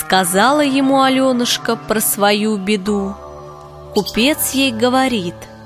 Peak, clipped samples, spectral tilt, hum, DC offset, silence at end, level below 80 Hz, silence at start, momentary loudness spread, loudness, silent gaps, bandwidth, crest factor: 0 dBFS; under 0.1%; -3.5 dB/octave; none; under 0.1%; 0 s; -46 dBFS; 0 s; 13 LU; -15 LUFS; none; 16 kHz; 16 dB